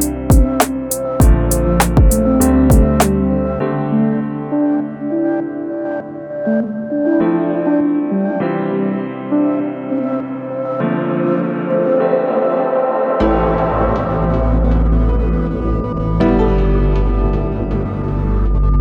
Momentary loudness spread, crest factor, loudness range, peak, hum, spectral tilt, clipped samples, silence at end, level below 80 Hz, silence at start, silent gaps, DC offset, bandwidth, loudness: 8 LU; 14 dB; 5 LU; 0 dBFS; none; -7 dB/octave; under 0.1%; 0 s; -20 dBFS; 0 s; none; under 0.1%; 19 kHz; -16 LUFS